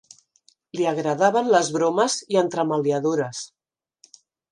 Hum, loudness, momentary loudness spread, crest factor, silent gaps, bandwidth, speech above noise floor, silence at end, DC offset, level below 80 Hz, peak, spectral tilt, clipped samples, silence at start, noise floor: none; -22 LUFS; 11 LU; 18 dB; none; 11 kHz; 41 dB; 1.05 s; under 0.1%; -76 dBFS; -6 dBFS; -4.5 dB/octave; under 0.1%; 0.75 s; -62 dBFS